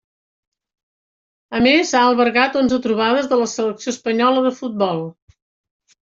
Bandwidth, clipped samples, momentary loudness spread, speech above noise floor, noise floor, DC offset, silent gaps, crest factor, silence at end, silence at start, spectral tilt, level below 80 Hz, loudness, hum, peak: 7.8 kHz; under 0.1%; 9 LU; over 73 dB; under -90 dBFS; under 0.1%; none; 16 dB; 1 s; 1.5 s; -4 dB/octave; -56 dBFS; -17 LUFS; none; -2 dBFS